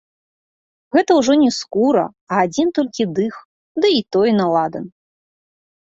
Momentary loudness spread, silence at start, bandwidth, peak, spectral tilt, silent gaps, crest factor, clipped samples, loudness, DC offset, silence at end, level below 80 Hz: 10 LU; 0.95 s; 8 kHz; -2 dBFS; -5 dB/octave; 2.21-2.27 s, 3.45-3.75 s; 16 dB; under 0.1%; -17 LUFS; under 0.1%; 1.1 s; -60 dBFS